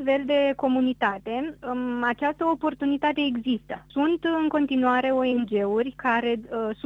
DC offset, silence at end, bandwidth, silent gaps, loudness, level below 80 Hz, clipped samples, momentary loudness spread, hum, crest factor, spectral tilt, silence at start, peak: under 0.1%; 0.1 s; 5.6 kHz; none; -25 LUFS; -58 dBFS; under 0.1%; 8 LU; none; 16 dB; -6.5 dB/octave; 0 s; -10 dBFS